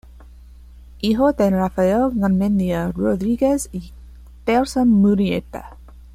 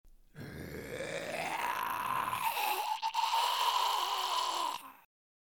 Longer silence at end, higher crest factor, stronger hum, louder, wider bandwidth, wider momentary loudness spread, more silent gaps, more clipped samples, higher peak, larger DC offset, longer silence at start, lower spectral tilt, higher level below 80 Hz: second, 0.1 s vs 0.5 s; about the same, 16 dB vs 18 dB; neither; first, -19 LUFS vs -33 LUFS; second, 15.5 kHz vs 19.5 kHz; second, 12 LU vs 15 LU; neither; neither; first, -4 dBFS vs -16 dBFS; neither; about the same, 0.15 s vs 0.05 s; first, -7 dB/octave vs -1.5 dB/octave; first, -40 dBFS vs -68 dBFS